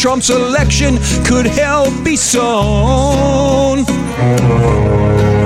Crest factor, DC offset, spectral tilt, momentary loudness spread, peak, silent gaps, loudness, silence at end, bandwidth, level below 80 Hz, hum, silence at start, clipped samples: 10 dB; under 0.1%; -5 dB/octave; 2 LU; -2 dBFS; none; -12 LUFS; 0 s; 14.5 kHz; -22 dBFS; none; 0 s; under 0.1%